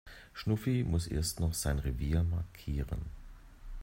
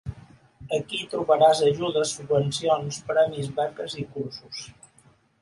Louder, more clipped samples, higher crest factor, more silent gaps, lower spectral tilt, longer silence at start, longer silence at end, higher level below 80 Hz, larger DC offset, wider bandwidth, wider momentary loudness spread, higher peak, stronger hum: second, -34 LUFS vs -24 LUFS; neither; about the same, 16 dB vs 20 dB; neither; about the same, -5.5 dB/octave vs -4.5 dB/octave; about the same, 0.05 s vs 0.05 s; second, 0 s vs 0.7 s; first, -42 dBFS vs -56 dBFS; neither; first, 16 kHz vs 11.5 kHz; about the same, 15 LU vs 17 LU; second, -18 dBFS vs -6 dBFS; neither